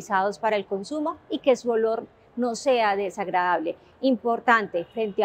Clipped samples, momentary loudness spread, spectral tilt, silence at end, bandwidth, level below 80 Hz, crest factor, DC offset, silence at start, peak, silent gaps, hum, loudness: under 0.1%; 8 LU; -4.5 dB/octave; 0 s; 14 kHz; -68 dBFS; 20 dB; under 0.1%; 0 s; -4 dBFS; none; none; -25 LUFS